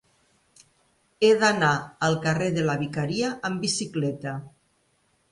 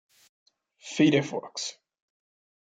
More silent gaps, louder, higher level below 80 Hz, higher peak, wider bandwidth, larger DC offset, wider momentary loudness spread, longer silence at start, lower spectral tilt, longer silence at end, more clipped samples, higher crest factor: neither; first, -24 LUFS vs -27 LUFS; first, -62 dBFS vs -74 dBFS; about the same, -8 dBFS vs -10 dBFS; first, 11.5 kHz vs 9.4 kHz; neither; second, 10 LU vs 14 LU; first, 1.2 s vs 0.85 s; about the same, -4.5 dB/octave vs -5 dB/octave; about the same, 0.85 s vs 0.95 s; neither; about the same, 18 dB vs 20 dB